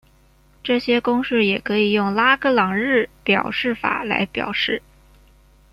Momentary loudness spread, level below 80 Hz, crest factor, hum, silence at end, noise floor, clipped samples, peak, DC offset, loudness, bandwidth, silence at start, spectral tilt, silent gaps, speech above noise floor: 6 LU; -52 dBFS; 18 dB; none; 0.95 s; -54 dBFS; under 0.1%; -2 dBFS; under 0.1%; -19 LUFS; 13 kHz; 0.65 s; -6.5 dB/octave; none; 35 dB